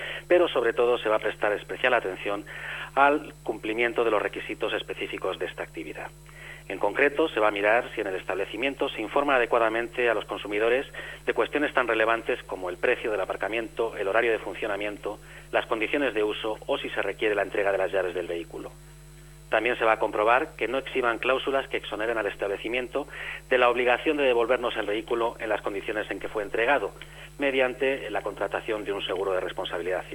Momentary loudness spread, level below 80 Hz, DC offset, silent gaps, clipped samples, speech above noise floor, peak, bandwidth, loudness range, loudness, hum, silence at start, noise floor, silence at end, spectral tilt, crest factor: 11 LU; -52 dBFS; under 0.1%; none; under 0.1%; 21 dB; -6 dBFS; 18 kHz; 3 LU; -26 LUFS; none; 0 s; -47 dBFS; 0 s; -4.5 dB/octave; 20 dB